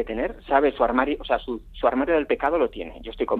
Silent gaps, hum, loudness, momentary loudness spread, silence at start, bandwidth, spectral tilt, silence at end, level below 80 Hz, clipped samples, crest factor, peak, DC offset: none; none; -23 LUFS; 10 LU; 0 s; 4.6 kHz; -7.5 dB/octave; 0 s; -42 dBFS; under 0.1%; 18 dB; -4 dBFS; under 0.1%